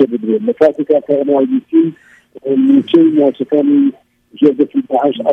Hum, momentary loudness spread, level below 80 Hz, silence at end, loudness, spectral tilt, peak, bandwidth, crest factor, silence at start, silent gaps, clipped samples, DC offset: none; 6 LU; -64 dBFS; 0 s; -13 LUFS; -8.5 dB/octave; 0 dBFS; 4.1 kHz; 12 dB; 0 s; none; under 0.1%; under 0.1%